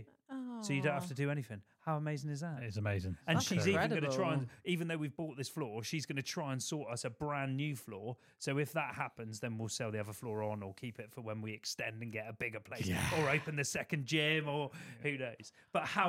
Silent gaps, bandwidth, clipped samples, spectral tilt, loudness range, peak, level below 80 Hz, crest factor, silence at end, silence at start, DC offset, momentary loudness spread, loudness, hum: none; 16.5 kHz; under 0.1%; -5 dB/octave; 5 LU; -16 dBFS; -68 dBFS; 22 dB; 0 s; 0 s; under 0.1%; 11 LU; -38 LUFS; none